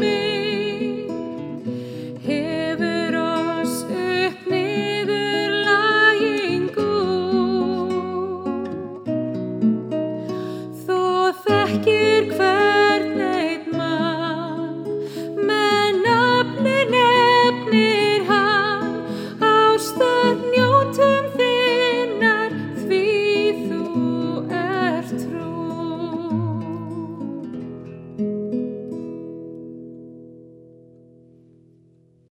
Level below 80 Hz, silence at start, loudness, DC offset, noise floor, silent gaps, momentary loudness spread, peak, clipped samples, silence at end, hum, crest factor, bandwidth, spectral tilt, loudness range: -66 dBFS; 0 s; -20 LUFS; under 0.1%; -56 dBFS; none; 14 LU; -2 dBFS; under 0.1%; 1.75 s; none; 18 dB; 16.5 kHz; -5 dB/octave; 11 LU